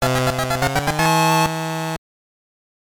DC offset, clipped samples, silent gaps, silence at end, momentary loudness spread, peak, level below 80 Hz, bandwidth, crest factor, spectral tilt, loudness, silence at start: under 0.1%; under 0.1%; none; 1 s; 10 LU; -6 dBFS; -42 dBFS; over 20 kHz; 14 dB; -4.5 dB/octave; -19 LUFS; 0 s